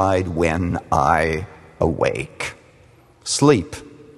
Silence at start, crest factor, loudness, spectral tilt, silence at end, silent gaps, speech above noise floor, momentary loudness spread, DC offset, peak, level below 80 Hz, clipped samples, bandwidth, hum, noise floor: 0 s; 20 dB; -20 LUFS; -5 dB/octave; 0.2 s; none; 32 dB; 16 LU; under 0.1%; 0 dBFS; -40 dBFS; under 0.1%; 12.5 kHz; none; -51 dBFS